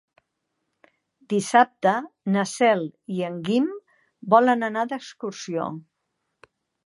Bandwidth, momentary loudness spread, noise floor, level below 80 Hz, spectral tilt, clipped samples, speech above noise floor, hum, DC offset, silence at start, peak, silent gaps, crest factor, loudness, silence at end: 11.5 kHz; 15 LU; -78 dBFS; -78 dBFS; -5 dB/octave; under 0.1%; 56 dB; none; under 0.1%; 1.3 s; -2 dBFS; none; 22 dB; -23 LUFS; 1.05 s